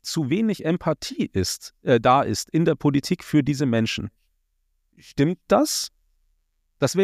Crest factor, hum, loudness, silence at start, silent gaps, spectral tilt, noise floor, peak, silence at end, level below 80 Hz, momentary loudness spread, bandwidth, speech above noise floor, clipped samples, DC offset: 18 dB; none; -22 LUFS; 0.05 s; none; -5.5 dB/octave; -70 dBFS; -4 dBFS; 0 s; -52 dBFS; 8 LU; 15.5 kHz; 48 dB; under 0.1%; under 0.1%